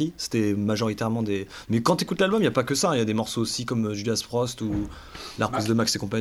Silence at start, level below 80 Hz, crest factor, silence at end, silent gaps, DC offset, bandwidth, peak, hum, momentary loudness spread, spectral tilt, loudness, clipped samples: 0 s; -50 dBFS; 18 dB; 0 s; none; under 0.1%; 16 kHz; -8 dBFS; none; 6 LU; -5 dB/octave; -25 LUFS; under 0.1%